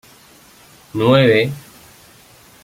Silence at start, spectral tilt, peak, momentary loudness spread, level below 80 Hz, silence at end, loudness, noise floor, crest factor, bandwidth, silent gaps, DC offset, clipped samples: 0.95 s; -6.5 dB/octave; -2 dBFS; 18 LU; -56 dBFS; 1.05 s; -14 LUFS; -46 dBFS; 18 dB; 16.5 kHz; none; under 0.1%; under 0.1%